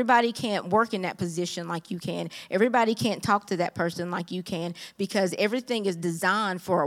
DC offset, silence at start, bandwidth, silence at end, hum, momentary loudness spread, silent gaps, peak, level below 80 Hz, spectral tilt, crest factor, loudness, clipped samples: under 0.1%; 0 s; 16.5 kHz; 0 s; none; 10 LU; none; -8 dBFS; -68 dBFS; -5 dB/octave; 20 dB; -27 LUFS; under 0.1%